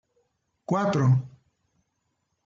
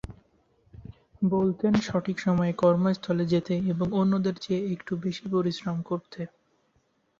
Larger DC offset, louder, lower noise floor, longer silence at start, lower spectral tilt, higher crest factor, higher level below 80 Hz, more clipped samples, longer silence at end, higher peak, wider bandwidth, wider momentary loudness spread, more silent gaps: neither; first, -24 LUFS vs -27 LUFS; first, -77 dBFS vs -70 dBFS; first, 0.7 s vs 0.1 s; about the same, -8 dB/octave vs -7.5 dB/octave; about the same, 16 dB vs 18 dB; second, -66 dBFS vs -56 dBFS; neither; first, 1.2 s vs 0.95 s; second, -12 dBFS vs -8 dBFS; about the same, 7.6 kHz vs 7.4 kHz; first, 23 LU vs 10 LU; neither